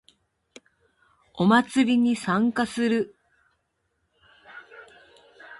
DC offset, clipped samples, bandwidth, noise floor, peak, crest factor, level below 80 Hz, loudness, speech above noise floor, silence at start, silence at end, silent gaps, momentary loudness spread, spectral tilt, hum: under 0.1%; under 0.1%; 11.5 kHz; -74 dBFS; -6 dBFS; 20 dB; -66 dBFS; -23 LUFS; 53 dB; 1.35 s; 0.05 s; none; 23 LU; -5.5 dB/octave; none